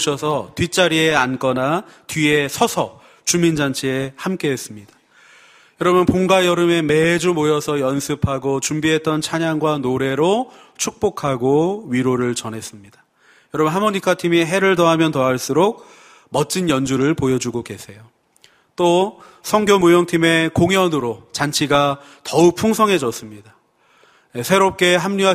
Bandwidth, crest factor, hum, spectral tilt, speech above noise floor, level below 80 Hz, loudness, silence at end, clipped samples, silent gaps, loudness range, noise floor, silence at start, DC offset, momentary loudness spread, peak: 15.5 kHz; 18 dB; none; -4.5 dB/octave; 38 dB; -50 dBFS; -17 LUFS; 0 s; under 0.1%; none; 4 LU; -55 dBFS; 0 s; under 0.1%; 11 LU; 0 dBFS